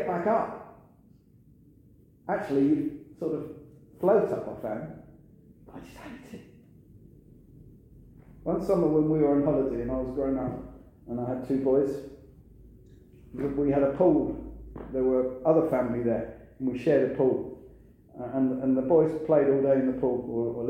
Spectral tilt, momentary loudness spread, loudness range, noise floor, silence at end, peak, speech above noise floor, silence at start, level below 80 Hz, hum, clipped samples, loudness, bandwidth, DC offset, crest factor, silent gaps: -9.5 dB/octave; 21 LU; 6 LU; -58 dBFS; 0 s; -10 dBFS; 31 dB; 0 s; -52 dBFS; none; under 0.1%; -27 LUFS; 9.6 kHz; under 0.1%; 18 dB; none